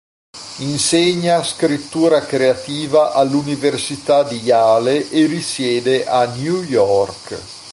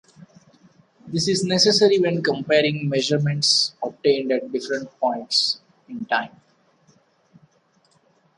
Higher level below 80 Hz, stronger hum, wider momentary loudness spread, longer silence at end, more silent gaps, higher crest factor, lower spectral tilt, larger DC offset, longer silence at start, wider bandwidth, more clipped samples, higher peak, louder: first, -54 dBFS vs -68 dBFS; neither; about the same, 9 LU vs 11 LU; second, 0 s vs 2.1 s; neither; second, 14 dB vs 20 dB; about the same, -4.5 dB/octave vs -4 dB/octave; neither; second, 0.35 s vs 1.05 s; about the same, 11.5 kHz vs 11.5 kHz; neither; about the same, -2 dBFS vs -4 dBFS; first, -16 LUFS vs -20 LUFS